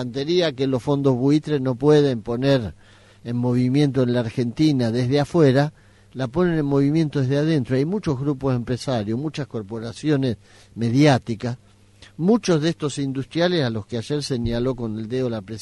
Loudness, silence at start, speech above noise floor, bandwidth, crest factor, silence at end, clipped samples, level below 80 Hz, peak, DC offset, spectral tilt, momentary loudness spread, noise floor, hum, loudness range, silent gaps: -21 LUFS; 0 s; 29 dB; 11.5 kHz; 16 dB; 0 s; under 0.1%; -48 dBFS; -4 dBFS; under 0.1%; -7 dB/octave; 11 LU; -50 dBFS; none; 3 LU; none